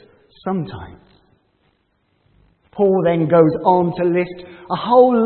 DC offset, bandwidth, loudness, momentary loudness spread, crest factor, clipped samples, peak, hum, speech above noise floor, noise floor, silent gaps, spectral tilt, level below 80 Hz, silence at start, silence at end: under 0.1%; 4.4 kHz; -17 LUFS; 18 LU; 18 dB; under 0.1%; 0 dBFS; none; 49 dB; -64 dBFS; none; -12.5 dB/octave; -56 dBFS; 0.45 s; 0 s